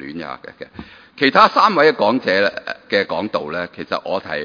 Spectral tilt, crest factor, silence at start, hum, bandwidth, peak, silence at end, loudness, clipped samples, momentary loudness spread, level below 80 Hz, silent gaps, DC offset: -5.5 dB/octave; 18 dB; 0 s; none; 5.4 kHz; 0 dBFS; 0 s; -16 LUFS; under 0.1%; 20 LU; -56 dBFS; none; under 0.1%